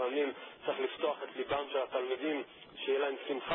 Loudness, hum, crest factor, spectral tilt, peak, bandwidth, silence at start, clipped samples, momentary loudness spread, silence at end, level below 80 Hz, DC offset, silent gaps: -36 LUFS; none; 14 dB; 0.5 dB/octave; -20 dBFS; 3.8 kHz; 0 s; under 0.1%; 6 LU; 0 s; -74 dBFS; under 0.1%; none